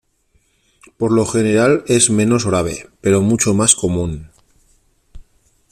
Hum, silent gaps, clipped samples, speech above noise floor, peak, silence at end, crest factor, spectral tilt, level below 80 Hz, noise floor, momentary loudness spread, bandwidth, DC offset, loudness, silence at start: none; none; under 0.1%; 45 dB; 0 dBFS; 0.5 s; 18 dB; -4.5 dB/octave; -44 dBFS; -60 dBFS; 10 LU; 15.5 kHz; under 0.1%; -15 LUFS; 1 s